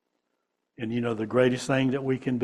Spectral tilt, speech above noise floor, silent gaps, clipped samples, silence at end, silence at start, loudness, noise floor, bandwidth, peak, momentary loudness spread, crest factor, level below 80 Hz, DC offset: -6.5 dB/octave; 53 dB; none; under 0.1%; 0 s; 0.8 s; -26 LUFS; -79 dBFS; 12 kHz; -8 dBFS; 7 LU; 20 dB; -60 dBFS; under 0.1%